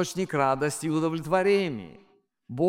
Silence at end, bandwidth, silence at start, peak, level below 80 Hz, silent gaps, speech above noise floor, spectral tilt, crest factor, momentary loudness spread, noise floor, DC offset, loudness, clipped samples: 0 s; 16.5 kHz; 0 s; -10 dBFS; -60 dBFS; none; 24 dB; -5.5 dB/octave; 18 dB; 16 LU; -50 dBFS; under 0.1%; -26 LUFS; under 0.1%